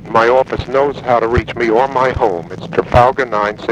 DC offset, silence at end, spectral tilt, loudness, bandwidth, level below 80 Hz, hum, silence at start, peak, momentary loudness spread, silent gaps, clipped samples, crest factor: under 0.1%; 0 s; -7 dB/octave; -14 LUFS; 10 kHz; -32 dBFS; none; 0 s; 0 dBFS; 6 LU; none; under 0.1%; 14 dB